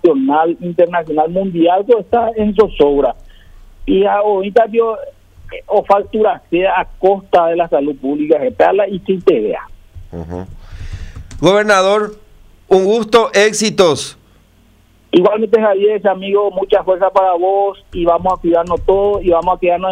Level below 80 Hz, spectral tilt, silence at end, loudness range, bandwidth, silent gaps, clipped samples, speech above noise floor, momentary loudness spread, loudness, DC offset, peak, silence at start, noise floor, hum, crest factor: -36 dBFS; -5 dB/octave; 0 s; 3 LU; 12.5 kHz; none; under 0.1%; 36 dB; 15 LU; -13 LUFS; under 0.1%; 0 dBFS; 0.05 s; -49 dBFS; none; 14 dB